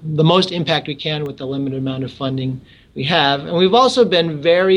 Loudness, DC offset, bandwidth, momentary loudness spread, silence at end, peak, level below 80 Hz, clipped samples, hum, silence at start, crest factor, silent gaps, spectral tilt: -17 LUFS; under 0.1%; 11 kHz; 12 LU; 0 s; -2 dBFS; -54 dBFS; under 0.1%; none; 0 s; 14 dB; none; -6 dB/octave